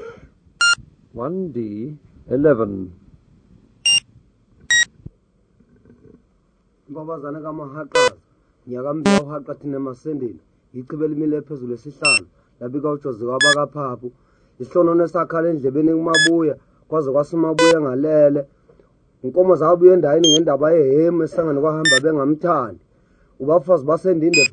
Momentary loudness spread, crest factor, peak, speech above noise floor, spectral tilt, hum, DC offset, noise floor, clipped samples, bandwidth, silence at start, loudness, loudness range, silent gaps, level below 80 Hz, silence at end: 17 LU; 18 dB; 0 dBFS; 43 dB; -4 dB/octave; none; under 0.1%; -61 dBFS; under 0.1%; 9.6 kHz; 0 s; -17 LUFS; 9 LU; none; -56 dBFS; 0 s